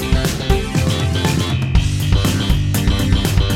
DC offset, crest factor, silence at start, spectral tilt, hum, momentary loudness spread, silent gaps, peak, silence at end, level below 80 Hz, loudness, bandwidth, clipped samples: under 0.1%; 14 dB; 0 s; -5.5 dB/octave; none; 2 LU; none; -2 dBFS; 0 s; -20 dBFS; -17 LUFS; 16.5 kHz; under 0.1%